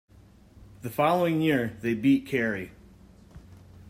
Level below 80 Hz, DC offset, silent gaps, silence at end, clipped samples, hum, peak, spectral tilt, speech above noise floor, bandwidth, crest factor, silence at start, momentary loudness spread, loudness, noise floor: -58 dBFS; under 0.1%; none; 0 s; under 0.1%; none; -10 dBFS; -7 dB/octave; 29 dB; 16 kHz; 18 dB; 0.6 s; 12 LU; -26 LUFS; -54 dBFS